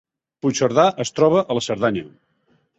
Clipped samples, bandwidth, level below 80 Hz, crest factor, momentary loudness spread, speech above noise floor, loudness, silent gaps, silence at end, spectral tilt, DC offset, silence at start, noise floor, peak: under 0.1%; 8.2 kHz; -58 dBFS; 20 dB; 7 LU; 45 dB; -19 LUFS; none; 0.7 s; -5 dB/octave; under 0.1%; 0.45 s; -63 dBFS; -2 dBFS